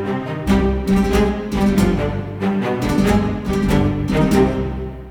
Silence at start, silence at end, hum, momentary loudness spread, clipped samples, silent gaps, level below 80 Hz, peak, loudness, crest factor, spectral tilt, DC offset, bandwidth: 0 s; 0 s; none; 7 LU; under 0.1%; none; -28 dBFS; -2 dBFS; -18 LUFS; 14 dB; -7 dB/octave; under 0.1%; 19.5 kHz